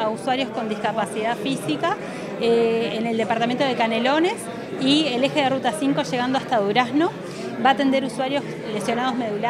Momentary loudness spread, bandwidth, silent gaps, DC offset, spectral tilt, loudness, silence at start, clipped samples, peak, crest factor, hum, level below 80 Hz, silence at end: 7 LU; 14 kHz; none; under 0.1%; -4.5 dB/octave; -22 LUFS; 0 s; under 0.1%; -4 dBFS; 18 dB; none; -62 dBFS; 0 s